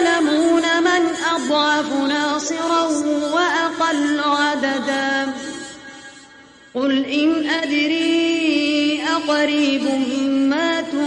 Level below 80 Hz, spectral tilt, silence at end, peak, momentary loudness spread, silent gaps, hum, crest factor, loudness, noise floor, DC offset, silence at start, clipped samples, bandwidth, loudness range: -62 dBFS; -2.5 dB/octave; 0 s; -4 dBFS; 6 LU; none; none; 14 dB; -18 LUFS; -45 dBFS; under 0.1%; 0 s; under 0.1%; 10.5 kHz; 4 LU